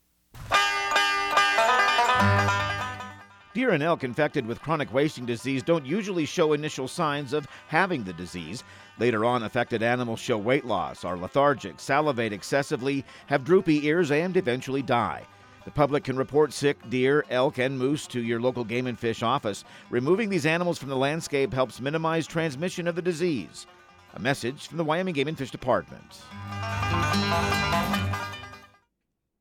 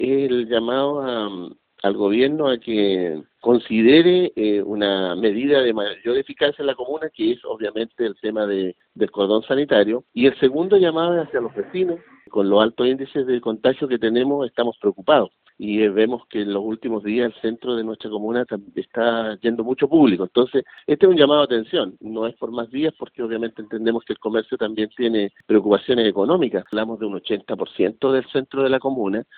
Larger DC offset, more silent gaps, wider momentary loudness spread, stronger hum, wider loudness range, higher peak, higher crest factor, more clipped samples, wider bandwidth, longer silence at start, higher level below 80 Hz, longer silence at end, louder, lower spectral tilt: neither; neither; about the same, 11 LU vs 10 LU; neither; about the same, 5 LU vs 5 LU; second, -8 dBFS vs -2 dBFS; about the same, 18 dB vs 18 dB; neither; first, 16.5 kHz vs 4.6 kHz; first, 0.35 s vs 0 s; first, -54 dBFS vs -60 dBFS; first, 0.8 s vs 0.15 s; second, -26 LUFS vs -20 LUFS; first, -5 dB/octave vs -3.5 dB/octave